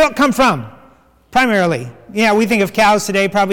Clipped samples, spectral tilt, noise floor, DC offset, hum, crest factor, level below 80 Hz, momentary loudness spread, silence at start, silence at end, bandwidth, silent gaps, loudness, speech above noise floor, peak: under 0.1%; -4.5 dB/octave; -48 dBFS; under 0.1%; none; 10 dB; -44 dBFS; 8 LU; 0 s; 0 s; 18.5 kHz; none; -14 LUFS; 34 dB; -4 dBFS